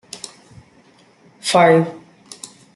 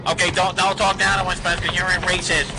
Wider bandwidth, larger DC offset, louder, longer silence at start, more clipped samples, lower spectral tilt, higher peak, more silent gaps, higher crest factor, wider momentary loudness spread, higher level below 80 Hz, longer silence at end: about the same, 12 kHz vs 11 kHz; neither; first, -15 LUFS vs -19 LUFS; first, 0.15 s vs 0 s; neither; first, -4.5 dB/octave vs -2.5 dB/octave; first, -2 dBFS vs -6 dBFS; neither; about the same, 18 dB vs 14 dB; first, 24 LU vs 2 LU; second, -64 dBFS vs -36 dBFS; first, 0.8 s vs 0 s